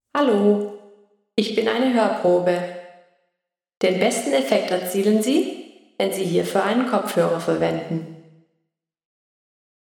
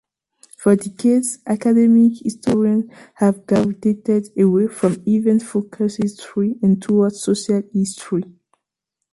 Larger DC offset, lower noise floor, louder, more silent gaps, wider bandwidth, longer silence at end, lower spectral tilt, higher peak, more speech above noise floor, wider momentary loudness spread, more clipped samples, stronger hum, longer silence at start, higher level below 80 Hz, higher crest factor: neither; about the same, -79 dBFS vs -81 dBFS; second, -21 LUFS vs -18 LUFS; neither; first, 19 kHz vs 11.5 kHz; first, 1.6 s vs 0.9 s; second, -5 dB/octave vs -7 dB/octave; about the same, -4 dBFS vs -2 dBFS; second, 59 dB vs 64 dB; first, 11 LU vs 8 LU; neither; neither; second, 0.15 s vs 0.6 s; second, -70 dBFS vs -58 dBFS; about the same, 18 dB vs 16 dB